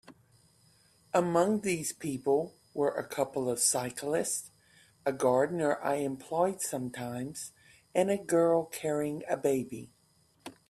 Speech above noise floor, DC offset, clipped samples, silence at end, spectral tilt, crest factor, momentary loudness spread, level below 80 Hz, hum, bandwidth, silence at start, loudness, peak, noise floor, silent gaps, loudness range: 37 dB; under 0.1%; under 0.1%; 0.2 s; -4.5 dB/octave; 20 dB; 11 LU; -72 dBFS; none; 14.5 kHz; 0.1 s; -31 LUFS; -12 dBFS; -68 dBFS; none; 2 LU